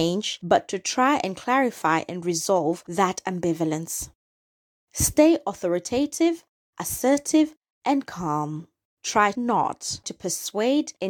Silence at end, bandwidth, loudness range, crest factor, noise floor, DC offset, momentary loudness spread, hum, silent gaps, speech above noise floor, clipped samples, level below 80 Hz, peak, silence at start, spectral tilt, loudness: 0 s; over 20 kHz; 3 LU; 20 dB; under -90 dBFS; under 0.1%; 10 LU; none; 4.15-4.87 s, 6.49-6.73 s, 7.57-7.61 s, 7.70-7.81 s, 8.85-8.97 s; over 66 dB; under 0.1%; -50 dBFS; -4 dBFS; 0 s; -4 dB/octave; -24 LUFS